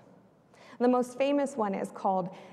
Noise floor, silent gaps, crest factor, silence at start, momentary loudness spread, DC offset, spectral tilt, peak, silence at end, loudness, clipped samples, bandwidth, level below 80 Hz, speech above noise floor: -59 dBFS; none; 16 dB; 0.7 s; 5 LU; under 0.1%; -6 dB/octave; -14 dBFS; 0 s; -29 LUFS; under 0.1%; 12.5 kHz; -80 dBFS; 30 dB